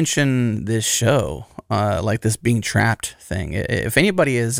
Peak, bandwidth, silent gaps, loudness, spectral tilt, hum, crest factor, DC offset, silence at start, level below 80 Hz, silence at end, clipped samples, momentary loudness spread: -2 dBFS; 16.5 kHz; none; -20 LUFS; -4.5 dB/octave; none; 18 dB; under 0.1%; 0 s; -42 dBFS; 0 s; under 0.1%; 9 LU